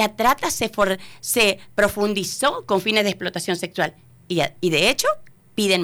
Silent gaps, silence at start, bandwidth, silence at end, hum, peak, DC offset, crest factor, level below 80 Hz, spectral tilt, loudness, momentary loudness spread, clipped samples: none; 0 s; over 20 kHz; 0 s; none; -8 dBFS; under 0.1%; 14 dB; -50 dBFS; -3 dB/octave; -21 LUFS; 8 LU; under 0.1%